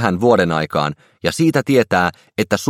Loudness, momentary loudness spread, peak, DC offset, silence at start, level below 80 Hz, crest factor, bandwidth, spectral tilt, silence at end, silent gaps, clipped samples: -17 LUFS; 9 LU; 0 dBFS; under 0.1%; 0 s; -50 dBFS; 16 dB; 16.5 kHz; -5.5 dB/octave; 0 s; none; under 0.1%